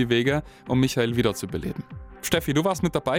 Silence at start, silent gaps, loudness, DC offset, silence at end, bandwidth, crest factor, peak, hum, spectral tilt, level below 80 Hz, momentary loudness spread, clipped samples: 0 s; none; -25 LUFS; under 0.1%; 0 s; 16.5 kHz; 18 dB; -6 dBFS; none; -5.5 dB/octave; -46 dBFS; 11 LU; under 0.1%